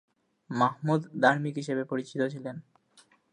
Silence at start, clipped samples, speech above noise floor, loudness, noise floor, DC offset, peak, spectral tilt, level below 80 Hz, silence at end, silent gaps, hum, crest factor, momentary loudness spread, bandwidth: 0.5 s; under 0.1%; 34 dB; -29 LUFS; -63 dBFS; under 0.1%; -10 dBFS; -6.5 dB/octave; -80 dBFS; 0.7 s; none; none; 22 dB; 14 LU; 10.5 kHz